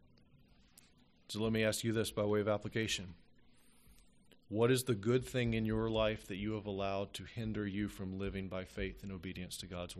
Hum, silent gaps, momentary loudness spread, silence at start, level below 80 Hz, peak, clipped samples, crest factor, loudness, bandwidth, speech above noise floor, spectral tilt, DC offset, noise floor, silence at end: none; none; 10 LU; 0.35 s; -56 dBFS; -20 dBFS; under 0.1%; 18 dB; -37 LUFS; 13 kHz; 30 dB; -5 dB/octave; under 0.1%; -66 dBFS; 0 s